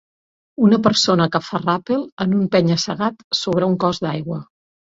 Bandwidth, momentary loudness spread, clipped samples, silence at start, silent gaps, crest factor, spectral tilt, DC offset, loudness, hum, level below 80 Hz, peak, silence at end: 7.8 kHz; 9 LU; under 0.1%; 0.6 s; 2.12-2.17 s, 3.24-3.31 s; 18 dB; -5.5 dB/octave; under 0.1%; -18 LUFS; none; -56 dBFS; -2 dBFS; 0.5 s